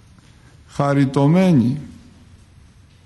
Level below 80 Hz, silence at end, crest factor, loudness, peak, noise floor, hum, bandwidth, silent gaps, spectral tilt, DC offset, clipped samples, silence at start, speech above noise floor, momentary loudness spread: -52 dBFS; 1.15 s; 14 dB; -17 LUFS; -6 dBFS; -48 dBFS; none; 11.5 kHz; none; -8.5 dB/octave; under 0.1%; under 0.1%; 0.75 s; 32 dB; 18 LU